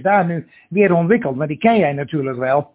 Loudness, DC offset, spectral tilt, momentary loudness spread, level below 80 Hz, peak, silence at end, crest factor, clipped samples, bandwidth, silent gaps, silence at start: -17 LUFS; under 0.1%; -11 dB/octave; 8 LU; -56 dBFS; -2 dBFS; 0.1 s; 16 dB; under 0.1%; 4 kHz; none; 0 s